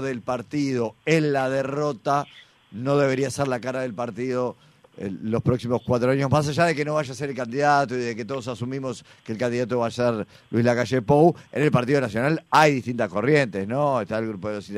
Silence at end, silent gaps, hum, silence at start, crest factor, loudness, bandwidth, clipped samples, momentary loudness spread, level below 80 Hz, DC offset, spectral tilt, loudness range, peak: 0 s; none; none; 0 s; 18 dB; -23 LUFS; 14.5 kHz; under 0.1%; 10 LU; -58 dBFS; under 0.1%; -6.5 dB/octave; 5 LU; -4 dBFS